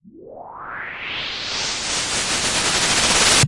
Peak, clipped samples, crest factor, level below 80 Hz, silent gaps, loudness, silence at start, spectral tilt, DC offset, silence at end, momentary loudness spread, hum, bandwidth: -4 dBFS; under 0.1%; 18 dB; -42 dBFS; none; -18 LUFS; 0.05 s; -1 dB/octave; under 0.1%; 0 s; 19 LU; none; 11.5 kHz